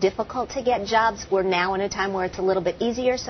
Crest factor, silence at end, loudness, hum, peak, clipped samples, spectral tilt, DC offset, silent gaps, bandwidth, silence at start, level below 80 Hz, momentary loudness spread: 16 dB; 0 s; -23 LUFS; none; -6 dBFS; under 0.1%; -4.5 dB/octave; under 0.1%; none; 6.4 kHz; 0 s; -48 dBFS; 4 LU